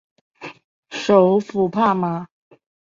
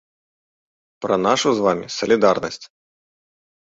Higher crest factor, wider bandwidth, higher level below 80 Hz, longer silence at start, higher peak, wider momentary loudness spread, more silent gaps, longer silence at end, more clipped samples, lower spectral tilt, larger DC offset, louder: about the same, 18 dB vs 20 dB; about the same, 7.6 kHz vs 8 kHz; about the same, -62 dBFS vs -60 dBFS; second, 0.4 s vs 1 s; about the same, -2 dBFS vs -2 dBFS; first, 23 LU vs 14 LU; first, 0.64-0.83 s vs none; second, 0.7 s vs 0.95 s; neither; first, -7 dB/octave vs -4 dB/octave; neither; about the same, -18 LUFS vs -19 LUFS